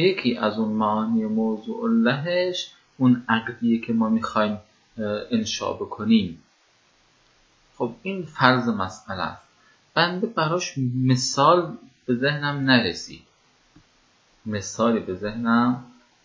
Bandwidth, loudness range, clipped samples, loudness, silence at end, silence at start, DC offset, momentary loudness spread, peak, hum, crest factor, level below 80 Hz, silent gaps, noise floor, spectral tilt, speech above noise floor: 7.6 kHz; 4 LU; under 0.1%; -23 LUFS; 0.4 s; 0 s; under 0.1%; 12 LU; 0 dBFS; none; 22 dB; -58 dBFS; none; -61 dBFS; -5 dB/octave; 39 dB